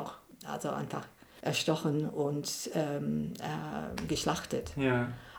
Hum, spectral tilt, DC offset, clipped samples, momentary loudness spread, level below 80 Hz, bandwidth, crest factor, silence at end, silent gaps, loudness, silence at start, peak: none; -5 dB/octave; under 0.1%; under 0.1%; 10 LU; -58 dBFS; over 20 kHz; 20 dB; 0 s; none; -34 LUFS; 0 s; -14 dBFS